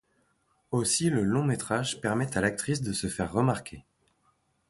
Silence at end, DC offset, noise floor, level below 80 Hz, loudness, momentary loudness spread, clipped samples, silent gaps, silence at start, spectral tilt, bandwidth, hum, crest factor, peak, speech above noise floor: 0.9 s; under 0.1%; -71 dBFS; -54 dBFS; -28 LUFS; 6 LU; under 0.1%; none; 0.7 s; -4.5 dB/octave; 12 kHz; none; 18 dB; -12 dBFS; 43 dB